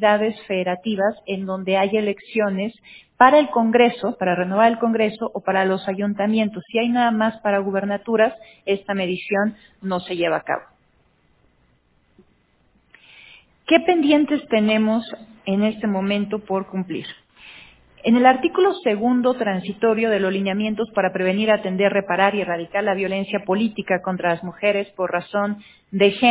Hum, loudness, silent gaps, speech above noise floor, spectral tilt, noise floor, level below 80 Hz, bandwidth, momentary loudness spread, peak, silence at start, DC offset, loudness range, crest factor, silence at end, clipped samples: none; -20 LUFS; none; 41 dB; -10 dB/octave; -61 dBFS; -62 dBFS; 4 kHz; 10 LU; 0 dBFS; 0 s; under 0.1%; 7 LU; 20 dB; 0 s; under 0.1%